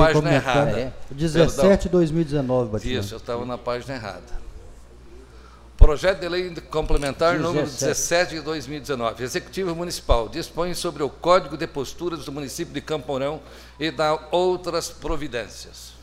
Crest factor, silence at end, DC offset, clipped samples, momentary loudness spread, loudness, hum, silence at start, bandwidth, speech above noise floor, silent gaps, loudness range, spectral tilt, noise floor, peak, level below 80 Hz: 22 dB; 0 s; under 0.1%; under 0.1%; 12 LU; -23 LUFS; none; 0 s; 15.5 kHz; 23 dB; none; 4 LU; -5 dB/octave; -45 dBFS; 0 dBFS; -30 dBFS